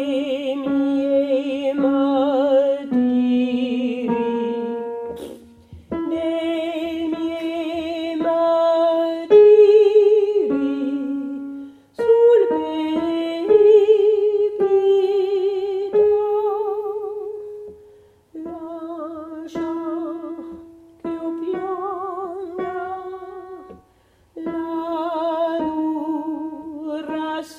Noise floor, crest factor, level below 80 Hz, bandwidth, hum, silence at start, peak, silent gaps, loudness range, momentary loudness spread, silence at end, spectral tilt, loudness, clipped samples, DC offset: -57 dBFS; 16 dB; -60 dBFS; 7 kHz; none; 0 s; -2 dBFS; none; 14 LU; 18 LU; 0 s; -6.5 dB/octave; -19 LUFS; under 0.1%; under 0.1%